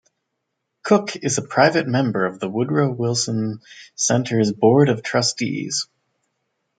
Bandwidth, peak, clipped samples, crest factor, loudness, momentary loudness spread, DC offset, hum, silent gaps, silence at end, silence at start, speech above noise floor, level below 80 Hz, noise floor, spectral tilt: 9.4 kHz; -2 dBFS; under 0.1%; 20 dB; -20 LUFS; 9 LU; under 0.1%; none; none; 0.95 s; 0.85 s; 58 dB; -64 dBFS; -77 dBFS; -4.5 dB/octave